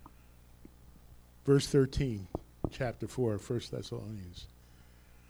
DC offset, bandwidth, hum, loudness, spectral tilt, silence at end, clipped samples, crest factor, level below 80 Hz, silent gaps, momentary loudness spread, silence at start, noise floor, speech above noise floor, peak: under 0.1%; over 20 kHz; 60 Hz at -55 dBFS; -34 LUFS; -6.5 dB/octave; 0.85 s; under 0.1%; 20 dB; -50 dBFS; none; 17 LU; 0 s; -58 dBFS; 25 dB; -14 dBFS